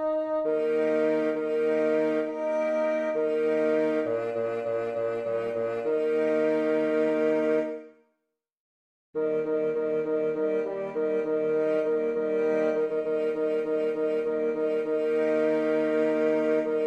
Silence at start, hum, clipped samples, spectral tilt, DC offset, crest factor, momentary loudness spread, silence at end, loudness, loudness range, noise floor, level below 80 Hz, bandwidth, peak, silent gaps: 0 s; none; under 0.1%; -7 dB/octave; under 0.1%; 12 dB; 5 LU; 0 s; -27 LUFS; 3 LU; -81 dBFS; -72 dBFS; 8.2 kHz; -14 dBFS; 8.53-9.13 s